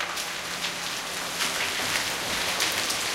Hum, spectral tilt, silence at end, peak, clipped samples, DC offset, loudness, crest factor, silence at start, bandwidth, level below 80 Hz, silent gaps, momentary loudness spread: none; -0.5 dB/octave; 0 s; -6 dBFS; under 0.1%; under 0.1%; -26 LUFS; 22 dB; 0 s; 16.5 kHz; -56 dBFS; none; 6 LU